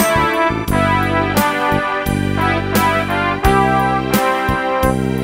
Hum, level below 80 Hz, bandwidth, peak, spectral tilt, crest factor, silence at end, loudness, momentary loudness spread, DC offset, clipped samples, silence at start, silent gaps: none; -30 dBFS; 16.5 kHz; 0 dBFS; -5 dB/octave; 16 dB; 0 s; -15 LUFS; 3 LU; under 0.1%; under 0.1%; 0 s; none